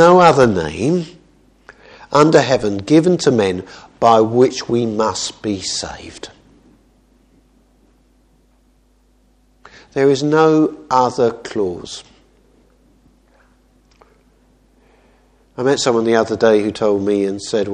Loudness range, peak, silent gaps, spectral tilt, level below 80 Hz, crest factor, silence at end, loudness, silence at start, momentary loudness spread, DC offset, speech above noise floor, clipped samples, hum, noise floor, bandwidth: 13 LU; 0 dBFS; none; -5.5 dB/octave; -50 dBFS; 18 dB; 0 s; -15 LUFS; 0 s; 17 LU; under 0.1%; 41 dB; under 0.1%; none; -55 dBFS; 10.5 kHz